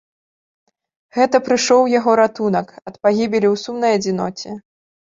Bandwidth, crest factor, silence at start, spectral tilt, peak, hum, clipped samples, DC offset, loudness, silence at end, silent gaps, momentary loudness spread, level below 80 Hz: 7.8 kHz; 16 dB; 1.15 s; -4.5 dB/octave; -2 dBFS; none; under 0.1%; under 0.1%; -17 LUFS; 0.45 s; none; 14 LU; -60 dBFS